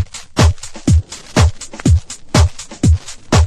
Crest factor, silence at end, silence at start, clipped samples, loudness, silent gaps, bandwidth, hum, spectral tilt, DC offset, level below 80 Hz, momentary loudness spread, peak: 14 dB; 0 s; 0 s; under 0.1%; -16 LUFS; none; 12.5 kHz; none; -5.5 dB/octave; under 0.1%; -20 dBFS; 5 LU; 0 dBFS